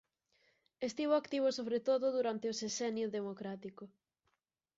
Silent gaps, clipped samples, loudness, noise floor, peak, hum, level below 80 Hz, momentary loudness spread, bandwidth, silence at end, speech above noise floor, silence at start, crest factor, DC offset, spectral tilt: none; under 0.1%; -36 LUFS; -84 dBFS; -22 dBFS; none; -82 dBFS; 14 LU; 7.6 kHz; 0.9 s; 48 dB; 0.8 s; 16 dB; under 0.1%; -4 dB/octave